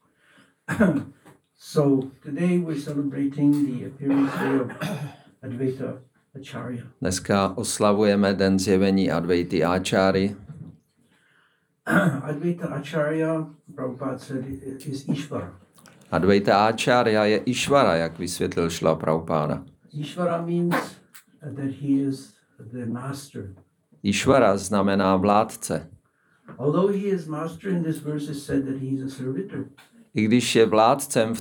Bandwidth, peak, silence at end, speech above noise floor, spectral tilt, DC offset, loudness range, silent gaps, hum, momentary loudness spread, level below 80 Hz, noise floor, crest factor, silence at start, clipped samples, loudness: over 20 kHz; -4 dBFS; 0 s; 42 dB; -5.5 dB/octave; under 0.1%; 7 LU; none; none; 16 LU; -62 dBFS; -65 dBFS; 20 dB; 0.7 s; under 0.1%; -23 LUFS